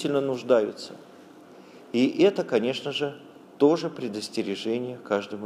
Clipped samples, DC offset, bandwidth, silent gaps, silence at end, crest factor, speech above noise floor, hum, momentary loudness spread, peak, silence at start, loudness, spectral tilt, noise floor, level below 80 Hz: under 0.1%; under 0.1%; 13.5 kHz; none; 0 s; 20 dB; 23 dB; none; 11 LU; -8 dBFS; 0 s; -26 LUFS; -5.5 dB/octave; -49 dBFS; -78 dBFS